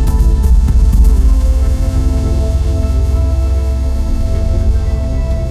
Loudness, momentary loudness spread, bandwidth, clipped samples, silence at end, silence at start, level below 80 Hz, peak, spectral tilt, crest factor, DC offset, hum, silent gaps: -14 LUFS; 6 LU; 13.5 kHz; under 0.1%; 0 s; 0 s; -10 dBFS; 0 dBFS; -7.5 dB/octave; 10 dB; 2%; none; none